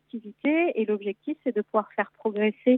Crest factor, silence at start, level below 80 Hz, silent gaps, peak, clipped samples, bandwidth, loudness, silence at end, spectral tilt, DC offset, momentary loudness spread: 16 dB; 0.15 s; -84 dBFS; none; -10 dBFS; under 0.1%; 4 kHz; -27 LUFS; 0 s; -10 dB/octave; under 0.1%; 7 LU